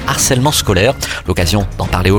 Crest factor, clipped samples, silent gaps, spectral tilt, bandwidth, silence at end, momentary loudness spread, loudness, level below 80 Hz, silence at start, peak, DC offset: 14 dB; under 0.1%; none; -4 dB/octave; 19.5 kHz; 0 s; 6 LU; -13 LUFS; -26 dBFS; 0 s; 0 dBFS; under 0.1%